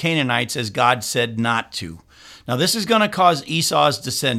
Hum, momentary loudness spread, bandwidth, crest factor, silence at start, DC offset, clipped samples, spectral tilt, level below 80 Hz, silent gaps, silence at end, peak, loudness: none; 11 LU; 17 kHz; 18 dB; 0 s; under 0.1%; under 0.1%; -3.5 dB/octave; -56 dBFS; none; 0 s; 0 dBFS; -19 LUFS